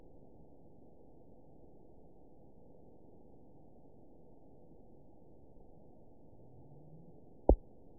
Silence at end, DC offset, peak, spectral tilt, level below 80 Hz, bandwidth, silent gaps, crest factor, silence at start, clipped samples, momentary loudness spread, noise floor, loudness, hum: 0.45 s; 0.2%; -10 dBFS; -4.5 dB/octave; -46 dBFS; 1 kHz; none; 34 dB; 7.5 s; under 0.1%; 25 LU; -61 dBFS; -34 LUFS; none